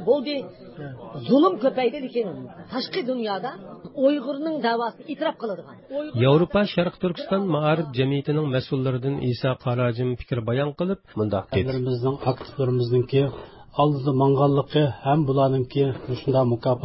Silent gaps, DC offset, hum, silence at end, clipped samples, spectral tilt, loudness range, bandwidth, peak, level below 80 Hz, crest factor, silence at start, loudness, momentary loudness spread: none; under 0.1%; none; 0 s; under 0.1%; -12 dB/octave; 4 LU; 5.8 kHz; -6 dBFS; -52 dBFS; 16 dB; 0 s; -24 LUFS; 12 LU